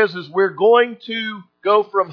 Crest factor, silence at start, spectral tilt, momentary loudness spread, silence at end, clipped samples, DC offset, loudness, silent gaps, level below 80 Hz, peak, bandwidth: 16 dB; 0 s; -7 dB/octave; 11 LU; 0 s; under 0.1%; under 0.1%; -17 LUFS; none; -80 dBFS; -2 dBFS; 5.4 kHz